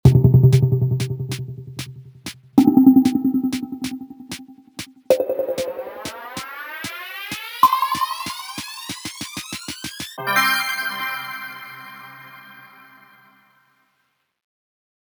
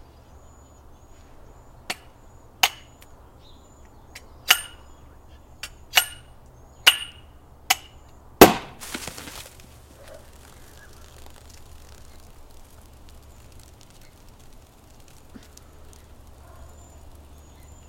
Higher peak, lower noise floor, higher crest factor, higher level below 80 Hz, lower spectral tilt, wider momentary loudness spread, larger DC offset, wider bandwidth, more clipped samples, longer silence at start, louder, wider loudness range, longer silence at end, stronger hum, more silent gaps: about the same, 0 dBFS vs 0 dBFS; first, -69 dBFS vs -49 dBFS; second, 20 dB vs 28 dB; about the same, -46 dBFS vs -48 dBFS; first, -6 dB/octave vs -2.5 dB/octave; second, 22 LU vs 32 LU; neither; first, over 20 kHz vs 17 kHz; neither; second, 0.05 s vs 1.9 s; about the same, -20 LUFS vs -20 LUFS; about the same, 8 LU vs 10 LU; second, 2.5 s vs 8.45 s; neither; neither